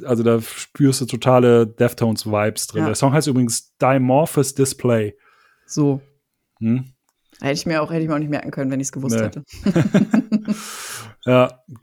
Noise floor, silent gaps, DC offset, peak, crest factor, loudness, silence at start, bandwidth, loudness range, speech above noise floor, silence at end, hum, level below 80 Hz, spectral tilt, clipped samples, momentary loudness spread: -66 dBFS; none; under 0.1%; 0 dBFS; 18 dB; -19 LUFS; 0 s; 19.5 kHz; 6 LU; 48 dB; 0.05 s; none; -54 dBFS; -6 dB/octave; under 0.1%; 11 LU